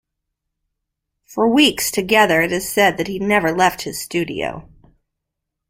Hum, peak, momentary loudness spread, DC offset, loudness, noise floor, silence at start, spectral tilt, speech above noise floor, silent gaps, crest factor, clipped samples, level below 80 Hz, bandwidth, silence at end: none; -2 dBFS; 13 LU; under 0.1%; -17 LUFS; -80 dBFS; 1.3 s; -3.5 dB/octave; 63 dB; none; 18 dB; under 0.1%; -50 dBFS; 16 kHz; 1.1 s